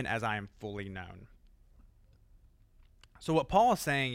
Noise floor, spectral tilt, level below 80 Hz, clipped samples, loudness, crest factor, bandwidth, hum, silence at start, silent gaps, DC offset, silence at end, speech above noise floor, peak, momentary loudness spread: -62 dBFS; -5 dB/octave; -56 dBFS; under 0.1%; -31 LUFS; 22 dB; 16 kHz; none; 0 s; none; under 0.1%; 0 s; 30 dB; -12 dBFS; 17 LU